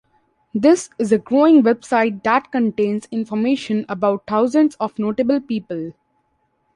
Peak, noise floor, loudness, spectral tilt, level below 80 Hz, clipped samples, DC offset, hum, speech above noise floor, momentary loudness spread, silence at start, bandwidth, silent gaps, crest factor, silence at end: -4 dBFS; -66 dBFS; -18 LUFS; -6 dB/octave; -62 dBFS; under 0.1%; under 0.1%; none; 49 dB; 11 LU; 0.55 s; 11 kHz; none; 16 dB; 0.85 s